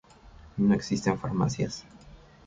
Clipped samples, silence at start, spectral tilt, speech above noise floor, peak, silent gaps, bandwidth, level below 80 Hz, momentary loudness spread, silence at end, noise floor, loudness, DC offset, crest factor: under 0.1%; 0.25 s; -6.5 dB/octave; 24 dB; -10 dBFS; none; 7.8 kHz; -52 dBFS; 12 LU; 0.3 s; -51 dBFS; -28 LUFS; under 0.1%; 18 dB